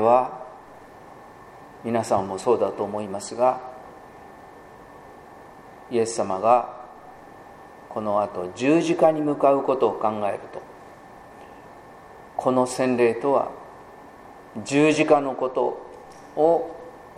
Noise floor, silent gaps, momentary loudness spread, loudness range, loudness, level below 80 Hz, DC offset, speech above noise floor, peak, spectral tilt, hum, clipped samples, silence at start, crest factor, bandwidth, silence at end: -45 dBFS; none; 25 LU; 5 LU; -23 LUFS; -62 dBFS; under 0.1%; 24 dB; -4 dBFS; -5.5 dB/octave; none; under 0.1%; 0 s; 20 dB; 13 kHz; 0.05 s